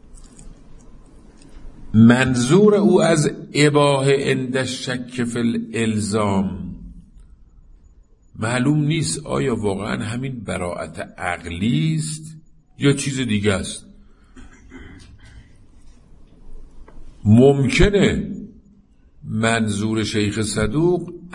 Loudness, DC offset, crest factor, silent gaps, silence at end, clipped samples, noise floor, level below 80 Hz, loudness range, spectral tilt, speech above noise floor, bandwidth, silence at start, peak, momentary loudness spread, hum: -19 LUFS; under 0.1%; 20 dB; none; 0 s; under 0.1%; -51 dBFS; -38 dBFS; 8 LU; -5.5 dB/octave; 33 dB; 11.5 kHz; 0.15 s; 0 dBFS; 14 LU; none